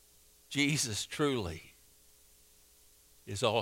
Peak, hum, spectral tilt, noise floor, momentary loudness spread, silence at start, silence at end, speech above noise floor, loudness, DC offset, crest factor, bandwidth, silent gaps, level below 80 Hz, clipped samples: -14 dBFS; none; -3.5 dB/octave; -63 dBFS; 15 LU; 0.5 s; 0 s; 30 dB; -33 LUFS; under 0.1%; 22 dB; 16 kHz; none; -64 dBFS; under 0.1%